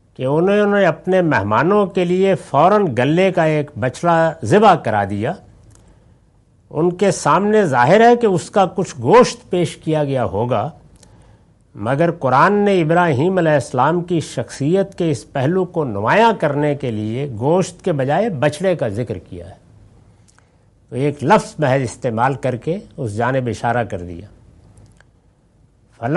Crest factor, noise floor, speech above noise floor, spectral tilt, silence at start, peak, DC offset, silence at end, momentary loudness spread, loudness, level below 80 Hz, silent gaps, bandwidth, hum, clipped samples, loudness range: 16 dB; -54 dBFS; 38 dB; -6.5 dB/octave; 0.2 s; -2 dBFS; under 0.1%; 0 s; 11 LU; -16 LUFS; -52 dBFS; none; 11.5 kHz; none; under 0.1%; 7 LU